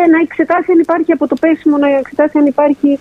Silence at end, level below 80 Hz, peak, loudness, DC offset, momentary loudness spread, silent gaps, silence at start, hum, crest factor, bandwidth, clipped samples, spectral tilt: 0.05 s; -54 dBFS; 0 dBFS; -12 LUFS; under 0.1%; 2 LU; none; 0 s; none; 10 dB; 5 kHz; under 0.1%; -7 dB/octave